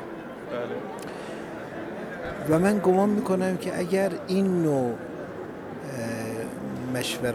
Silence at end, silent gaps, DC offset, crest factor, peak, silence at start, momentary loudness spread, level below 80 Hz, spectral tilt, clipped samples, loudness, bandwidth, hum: 0 s; none; under 0.1%; 18 dB; -10 dBFS; 0 s; 14 LU; -58 dBFS; -6 dB/octave; under 0.1%; -28 LUFS; 16 kHz; none